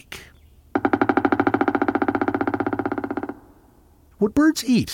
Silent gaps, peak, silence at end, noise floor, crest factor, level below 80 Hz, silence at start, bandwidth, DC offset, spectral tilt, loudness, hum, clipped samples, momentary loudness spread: none; -4 dBFS; 0 s; -53 dBFS; 18 dB; -50 dBFS; 0.1 s; 17 kHz; under 0.1%; -5.5 dB/octave; -22 LUFS; none; under 0.1%; 11 LU